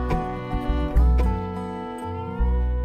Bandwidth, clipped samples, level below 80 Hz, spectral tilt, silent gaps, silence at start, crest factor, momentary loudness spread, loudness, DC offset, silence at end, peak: 8.6 kHz; under 0.1%; -24 dBFS; -8.5 dB/octave; none; 0 s; 14 dB; 10 LU; -25 LUFS; under 0.1%; 0 s; -8 dBFS